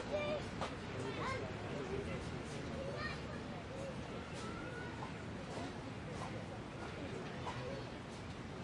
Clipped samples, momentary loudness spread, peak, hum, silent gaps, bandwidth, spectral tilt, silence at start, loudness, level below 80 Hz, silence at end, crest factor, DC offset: under 0.1%; 6 LU; -28 dBFS; none; none; 11.5 kHz; -5.5 dB/octave; 0 s; -45 LUFS; -60 dBFS; 0 s; 16 dB; under 0.1%